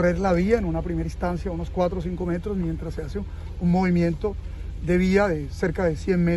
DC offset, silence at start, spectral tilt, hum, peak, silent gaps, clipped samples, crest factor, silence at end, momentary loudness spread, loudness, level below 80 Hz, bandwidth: under 0.1%; 0 s; -8 dB/octave; none; -8 dBFS; none; under 0.1%; 16 dB; 0 s; 11 LU; -25 LUFS; -34 dBFS; 11.5 kHz